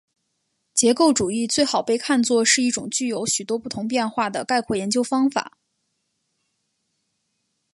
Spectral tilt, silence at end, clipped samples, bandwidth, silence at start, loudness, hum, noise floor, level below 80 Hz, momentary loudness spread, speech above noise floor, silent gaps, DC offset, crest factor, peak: -2.5 dB/octave; 2.25 s; under 0.1%; 11.5 kHz; 0.75 s; -21 LUFS; none; -74 dBFS; -62 dBFS; 8 LU; 53 dB; none; under 0.1%; 20 dB; -4 dBFS